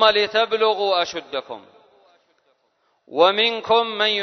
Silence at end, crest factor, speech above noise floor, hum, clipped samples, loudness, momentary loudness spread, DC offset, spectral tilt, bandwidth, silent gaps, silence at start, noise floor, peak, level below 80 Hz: 0 s; 20 dB; 47 dB; none; under 0.1%; -19 LUFS; 14 LU; under 0.1%; -2.5 dB/octave; 6.4 kHz; none; 0 s; -67 dBFS; -2 dBFS; -66 dBFS